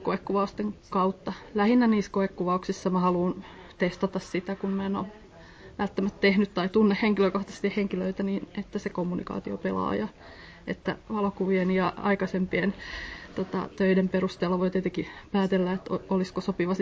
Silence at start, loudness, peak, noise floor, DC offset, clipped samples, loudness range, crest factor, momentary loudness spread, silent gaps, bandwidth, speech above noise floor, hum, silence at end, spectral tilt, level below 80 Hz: 0 s; -28 LUFS; -10 dBFS; -48 dBFS; under 0.1%; under 0.1%; 4 LU; 18 dB; 11 LU; none; 8 kHz; 21 dB; none; 0 s; -7 dB/octave; -54 dBFS